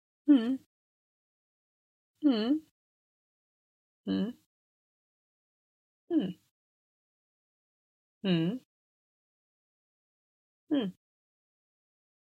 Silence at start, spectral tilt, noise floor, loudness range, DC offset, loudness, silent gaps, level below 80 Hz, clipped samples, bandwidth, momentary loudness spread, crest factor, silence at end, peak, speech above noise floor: 0.25 s; -8.5 dB/octave; under -90 dBFS; 6 LU; under 0.1%; -31 LUFS; 0.66-2.14 s, 2.71-4.04 s, 4.46-6.08 s, 6.51-8.21 s, 8.65-10.67 s; -84 dBFS; under 0.1%; 4.9 kHz; 13 LU; 22 dB; 1.3 s; -12 dBFS; over 61 dB